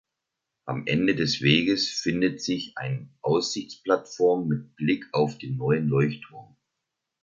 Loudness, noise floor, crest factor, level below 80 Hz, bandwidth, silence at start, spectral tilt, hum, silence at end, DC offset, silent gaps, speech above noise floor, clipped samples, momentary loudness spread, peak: -25 LUFS; -84 dBFS; 22 dB; -60 dBFS; 7.8 kHz; 0.65 s; -5.5 dB/octave; none; 0.8 s; under 0.1%; none; 59 dB; under 0.1%; 11 LU; -4 dBFS